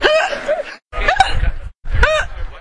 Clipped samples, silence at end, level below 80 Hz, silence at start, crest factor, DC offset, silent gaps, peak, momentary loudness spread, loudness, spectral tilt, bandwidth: under 0.1%; 0 s; -22 dBFS; 0 s; 16 dB; under 0.1%; none; 0 dBFS; 13 LU; -17 LUFS; -4 dB/octave; 11 kHz